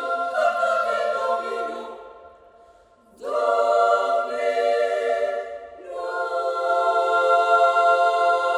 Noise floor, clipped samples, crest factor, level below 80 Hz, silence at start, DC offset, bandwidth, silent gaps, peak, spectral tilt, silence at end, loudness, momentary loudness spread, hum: -54 dBFS; under 0.1%; 16 dB; -68 dBFS; 0 s; under 0.1%; 11.5 kHz; none; -6 dBFS; -1.5 dB/octave; 0 s; -21 LUFS; 15 LU; none